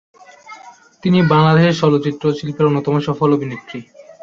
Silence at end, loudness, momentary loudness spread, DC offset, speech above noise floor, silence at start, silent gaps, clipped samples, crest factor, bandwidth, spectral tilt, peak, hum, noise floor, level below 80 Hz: 0.2 s; -15 LUFS; 15 LU; under 0.1%; 27 dB; 0.5 s; none; under 0.1%; 14 dB; 7.2 kHz; -7.5 dB/octave; -2 dBFS; none; -42 dBFS; -54 dBFS